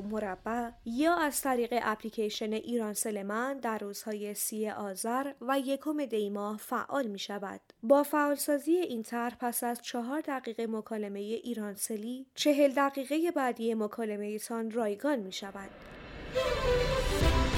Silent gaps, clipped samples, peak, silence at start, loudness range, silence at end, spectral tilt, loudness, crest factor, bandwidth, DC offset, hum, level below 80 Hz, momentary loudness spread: none; under 0.1%; -12 dBFS; 0 s; 3 LU; 0 s; -4.5 dB/octave; -32 LUFS; 20 dB; 18 kHz; under 0.1%; none; -44 dBFS; 10 LU